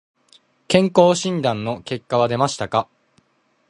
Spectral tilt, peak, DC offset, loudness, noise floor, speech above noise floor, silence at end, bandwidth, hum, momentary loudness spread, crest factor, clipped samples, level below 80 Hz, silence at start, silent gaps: -5 dB/octave; 0 dBFS; under 0.1%; -19 LUFS; -64 dBFS; 46 dB; 0.85 s; 11 kHz; none; 11 LU; 20 dB; under 0.1%; -58 dBFS; 0.7 s; none